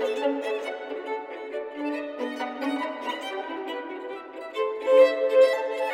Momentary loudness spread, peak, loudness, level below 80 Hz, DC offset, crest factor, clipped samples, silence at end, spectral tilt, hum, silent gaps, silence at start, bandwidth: 15 LU; -6 dBFS; -26 LUFS; -76 dBFS; under 0.1%; 18 dB; under 0.1%; 0 s; -2.5 dB/octave; none; none; 0 s; 11 kHz